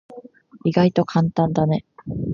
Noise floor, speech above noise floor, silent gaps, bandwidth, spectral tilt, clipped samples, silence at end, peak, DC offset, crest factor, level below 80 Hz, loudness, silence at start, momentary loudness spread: -43 dBFS; 24 dB; none; 7 kHz; -8.5 dB/octave; under 0.1%; 0 s; -2 dBFS; under 0.1%; 18 dB; -48 dBFS; -20 LUFS; 0.1 s; 9 LU